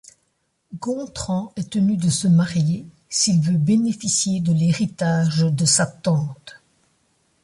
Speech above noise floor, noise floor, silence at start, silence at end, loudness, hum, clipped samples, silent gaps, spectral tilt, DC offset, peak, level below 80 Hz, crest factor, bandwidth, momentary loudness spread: 50 dB; -70 dBFS; 0.7 s; 0.95 s; -20 LUFS; none; under 0.1%; none; -5 dB/octave; under 0.1%; -6 dBFS; -54 dBFS; 16 dB; 11.5 kHz; 10 LU